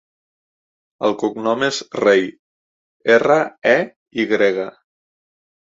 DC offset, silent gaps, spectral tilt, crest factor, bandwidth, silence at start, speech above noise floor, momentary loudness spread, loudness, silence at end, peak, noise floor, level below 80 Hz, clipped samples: under 0.1%; 2.39-3.00 s, 3.96-4.06 s; -4.5 dB/octave; 18 dB; 7.8 kHz; 1 s; over 73 dB; 11 LU; -18 LUFS; 1.05 s; -2 dBFS; under -90 dBFS; -66 dBFS; under 0.1%